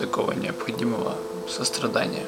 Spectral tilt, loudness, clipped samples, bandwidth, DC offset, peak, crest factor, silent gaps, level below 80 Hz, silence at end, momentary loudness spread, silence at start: -4 dB/octave; -27 LUFS; under 0.1%; 17 kHz; under 0.1%; -6 dBFS; 20 dB; none; -62 dBFS; 0 s; 6 LU; 0 s